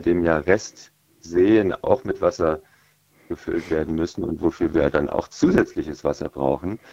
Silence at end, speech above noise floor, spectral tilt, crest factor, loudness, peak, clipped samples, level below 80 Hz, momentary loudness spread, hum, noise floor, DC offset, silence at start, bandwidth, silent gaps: 0.15 s; 37 dB; -6.5 dB/octave; 20 dB; -22 LUFS; -2 dBFS; under 0.1%; -46 dBFS; 9 LU; none; -59 dBFS; under 0.1%; 0 s; 8 kHz; none